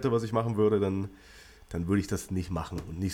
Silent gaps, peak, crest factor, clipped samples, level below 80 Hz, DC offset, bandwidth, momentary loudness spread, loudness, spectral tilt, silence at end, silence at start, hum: none; -14 dBFS; 16 dB; under 0.1%; -50 dBFS; under 0.1%; 16.5 kHz; 11 LU; -30 LUFS; -7 dB/octave; 0 s; 0 s; none